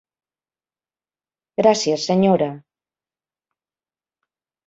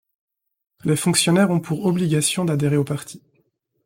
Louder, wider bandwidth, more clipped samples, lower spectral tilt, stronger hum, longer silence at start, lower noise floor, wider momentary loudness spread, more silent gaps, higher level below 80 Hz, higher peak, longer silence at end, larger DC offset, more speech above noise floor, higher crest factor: about the same, -18 LUFS vs -20 LUFS; second, 8 kHz vs 16.5 kHz; neither; about the same, -5.5 dB/octave vs -5 dB/octave; neither; first, 1.6 s vs 0.85 s; first, under -90 dBFS vs -67 dBFS; second, 8 LU vs 11 LU; neither; about the same, -64 dBFS vs -60 dBFS; about the same, -2 dBFS vs -4 dBFS; first, 2.1 s vs 0.65 s; neither; first, over 73 dB vs 48 dB; about the same, 22 dB vs 18 dB